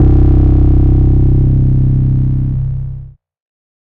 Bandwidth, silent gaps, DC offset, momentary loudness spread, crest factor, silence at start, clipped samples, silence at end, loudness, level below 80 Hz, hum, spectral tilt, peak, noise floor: 2.4 kHz; none; under 0.1%; 10 LU; 8 dB; 0 s; under 0.1%; 0.75 s; -11 LUFS; -14 dBFS; none; -13 dB/octave; -2 dBFS; -30 dBFS